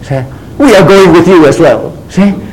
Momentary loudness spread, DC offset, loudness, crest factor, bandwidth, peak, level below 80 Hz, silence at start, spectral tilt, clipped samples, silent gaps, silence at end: 13 LU; under 0.1%; -5 LUFS; 6 dB; 16.5 kHz; 0 dBFS; -32 dBFS; 0 s; -6.5 dB/octave; 6%; none; 0 s